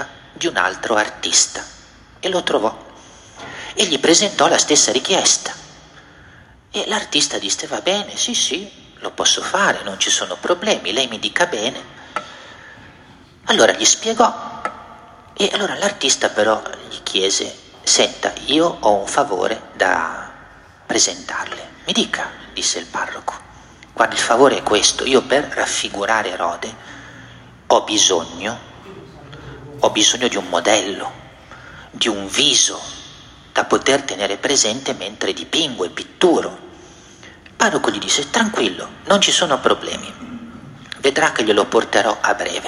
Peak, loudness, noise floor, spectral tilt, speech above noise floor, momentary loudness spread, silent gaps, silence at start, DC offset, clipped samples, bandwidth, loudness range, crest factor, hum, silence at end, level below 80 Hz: 0 dBFS; -17 LUFS; -45 dBFS; -1 dB/octave; 27 dB; 19 LU; none; 0 s; under 0.1%; under 0.1%; 13.5 kHz; 4 LU; 20 dB; none; 0 s; -54 dBFS